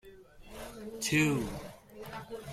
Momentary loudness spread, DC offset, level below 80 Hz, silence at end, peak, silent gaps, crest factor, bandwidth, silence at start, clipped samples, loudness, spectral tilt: 21 LU; under 0.1%; -56 dBFS; 0 s; -16 dBFS; none; 18 dB; 16 kHz; 0.05 s; under 0.1%; -32 LUFS; -4.5 dB/octave